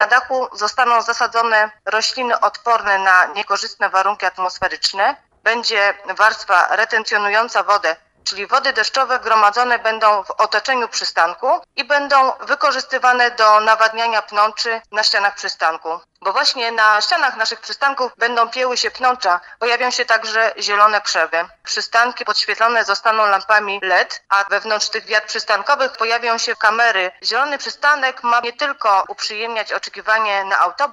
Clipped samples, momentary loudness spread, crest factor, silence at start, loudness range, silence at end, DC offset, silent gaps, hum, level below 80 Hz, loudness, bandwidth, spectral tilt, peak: under 0.1%; 7 LU; 16 dB; 0 s; 2 LU; 0 s; under 0.1%; none; none; -64 dBFS; -16 LUFS; 12 kHz; 0 dB/octave; 0 dBFS